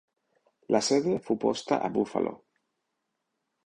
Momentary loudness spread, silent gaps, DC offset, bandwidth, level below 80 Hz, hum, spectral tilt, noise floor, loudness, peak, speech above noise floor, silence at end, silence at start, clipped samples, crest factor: 6 LU; none; under 0.1%; 11 kHz; -68 dBFS; none; -4.5 dB/octave; -81 dBFS; -28 LUFS; -8 dBFS; 54 dB; 1.3 s; 0.7 s; under 0.1%; 22 dB